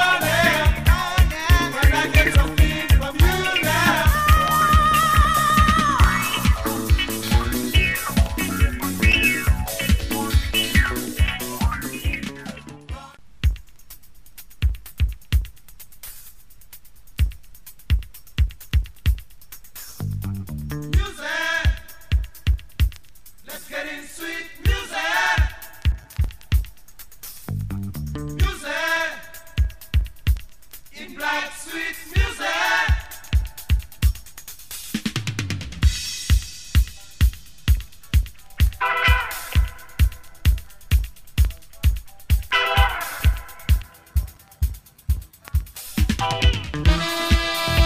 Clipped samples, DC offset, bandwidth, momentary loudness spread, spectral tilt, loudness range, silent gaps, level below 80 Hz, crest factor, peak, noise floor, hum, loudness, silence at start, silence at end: under 0.1%; 0.8%; 15.5 kHz; 14 LU; -4.5 dB/octave; 11 LU; none; -24 dBFS; 18 dB; -4 dBFS; -49 dBFS; none; -22 LUFS; 0 s; 0 s